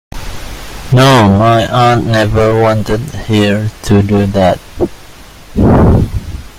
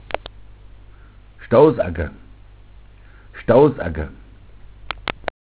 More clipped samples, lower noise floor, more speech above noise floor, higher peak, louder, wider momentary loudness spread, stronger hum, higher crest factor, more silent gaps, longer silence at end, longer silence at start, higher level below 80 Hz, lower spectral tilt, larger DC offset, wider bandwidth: neither; second, -33 dBFS vs -44 dBFS; second, 24 dB vs 28 dB; about the same, 0 dBFS vs 0 dBFS; first, -10 LUFS vs -19 LUFS; about the same, 17 LU vs 19 LU; neither; second, 10 dB vs 22 dB; neither; second, 0 s vs 0.25 s; about the same, 0.15 s vs 0.1 s; first, -24 dBFS vs -38 dBFS; second, -6.5 dB/octave vs -11 dB/octave; neither; first, 16 kHz vs 4 kHz